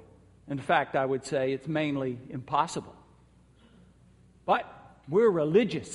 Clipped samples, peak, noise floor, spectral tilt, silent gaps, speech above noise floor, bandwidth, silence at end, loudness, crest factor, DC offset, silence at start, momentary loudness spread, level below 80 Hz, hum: under 0.1%; -10 dBFS; -59 dBFS; -6 dB/octave; none; 32 dB; 11.5 kHz; 0 s; -28 LUFS; 20 dB; under 0.1%; 0.45 s; 14 LU; -64 dBFS; none